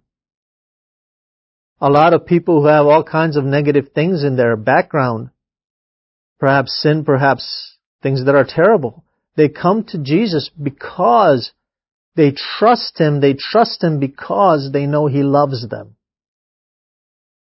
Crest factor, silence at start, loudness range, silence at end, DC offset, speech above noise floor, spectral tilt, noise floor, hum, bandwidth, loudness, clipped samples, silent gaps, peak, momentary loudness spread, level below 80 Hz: 16 dB; 1.8 s; 4 LU; 1.6 s; under 0.1%; over 76 dB; -10 dB/octave; under -90 dBFS; none; 5.8 kHz; -14 LUFS; under 0.1%; 5.64-6.36 s, 7.86-7.99 s, 11.92-12.12 s; 0 dBFS; 13 LU; -56 dBFS